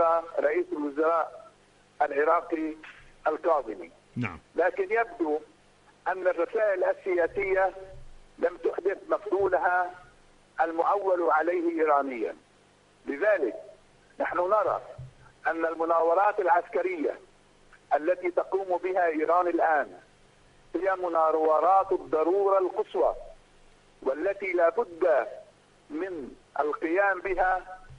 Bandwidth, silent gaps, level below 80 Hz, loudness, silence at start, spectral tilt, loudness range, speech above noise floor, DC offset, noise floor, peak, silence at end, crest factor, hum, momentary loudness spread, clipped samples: 10.5 kHz; none; -58 dBFS; -27 LUFS; 0 s; -7 dB/octave; 4 LU; 34 dB; under 0.1%; -60 dBFS; -10 dBFS; 0 s; 16 dB; 50 Hz at -70 dBFS; 12 LU; under 0.1%